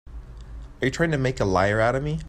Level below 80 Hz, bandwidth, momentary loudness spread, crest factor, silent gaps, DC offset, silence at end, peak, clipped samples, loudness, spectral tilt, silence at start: -38 dBFS; 12.5 kHz; 22 LU; 18 dB; none; under 0.1%; 0 s; -6 dBFS; under 0.1%; -23 LUFS; -6 dB/octave; 0.05 s